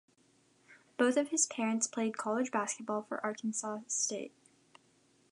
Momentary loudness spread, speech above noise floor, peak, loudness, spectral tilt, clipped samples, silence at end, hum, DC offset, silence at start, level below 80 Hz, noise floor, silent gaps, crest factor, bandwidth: 8 LU; 35 dB; -16 dBFS; -34 LUFS; -2.5 dB/octave; under 0.1%; 1.05 s; none; under 0.1%; 0.7 s; -90 dBFS; -69 dBFS; none; 20 dB; 11 kHz